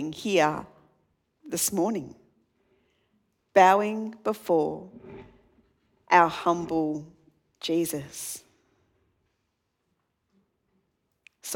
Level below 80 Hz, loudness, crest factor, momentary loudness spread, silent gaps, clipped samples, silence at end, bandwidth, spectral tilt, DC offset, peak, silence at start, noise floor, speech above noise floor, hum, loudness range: -68 dBFS; -25 LUFS; 24 dB; 21 LU; none; under 0.1%; 0 s; 19 kHz; -4 dB/octave; under 0.1%; -4 dBFS; 0 s; -78 dBFS; 52 dB; none; 10 LU